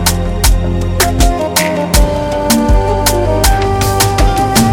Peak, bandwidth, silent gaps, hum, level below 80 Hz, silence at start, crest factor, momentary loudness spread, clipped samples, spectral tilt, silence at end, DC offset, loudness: 0 dBFS; 17.5 kHz; none; none; -16 dBFS; 0 s; 10 dB; 3 LU; under 0.1%; -4.5 dB/octave; 0 s; under 0.1%; -12 LUFS